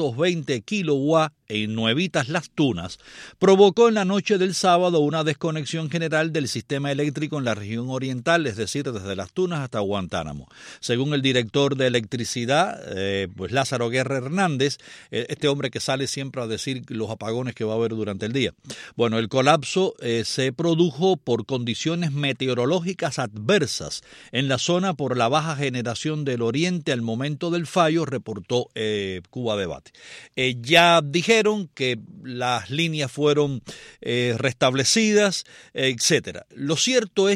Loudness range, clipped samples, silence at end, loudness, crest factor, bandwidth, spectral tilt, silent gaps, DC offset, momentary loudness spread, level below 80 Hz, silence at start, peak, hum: 6 LU; under 0.1%; 0 s; -23 LUFS; 20 dB; 14.5 kHz; -4.5 dB/octave; none; under 0.1%; 11 LU; -60 dBFS; 0 s; -2 dBFS; none